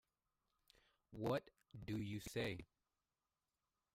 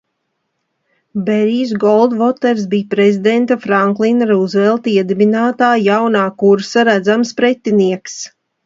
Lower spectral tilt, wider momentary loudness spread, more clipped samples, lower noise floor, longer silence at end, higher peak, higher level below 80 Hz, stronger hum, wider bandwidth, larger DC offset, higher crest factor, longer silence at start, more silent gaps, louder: about the same, -6 dB/octave vs -6 dB/octave; first, 15 LU vs 5 LU; neither; first, under -90 dBFS vs -70 dBFS; first, 1.3 s vs 0.4 s; second, -30 dBFS vs 0 dBFS; second, -70 dBFS vs -62 dBFS; neither; first, 16 kHz vs 7.8 kHz; neither; first, 20 dB vs 14 dB; about the same, 1.1 s vs 1.15 s; neither; second, -46 LUFS vs -13 LUFS